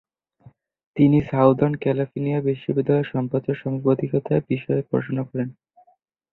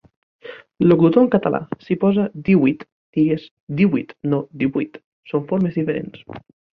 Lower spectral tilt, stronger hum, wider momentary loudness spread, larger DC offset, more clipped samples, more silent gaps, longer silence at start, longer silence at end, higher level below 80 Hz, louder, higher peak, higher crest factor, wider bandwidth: about the same, -11.5 dB/octave vs -11 dB/octave; neither; second, 9 LU vs 20 LU; neither; neither; second, none vs 2.92-3.13 s, 3.51-3.67 s, 5.04-5.23 s; first, 0.95 s vs 0.45 s; first, 0.8 s vs 0.35 s; about the same, -56 dBFS vs -56 dBFS; second, -22 LUFS vs -19 LUFS; about the same, -4 dBFS vs -2 dBFS; about the same, 20 dB vs 18 dB; second, 4.1 kHz vs 5.2 kHz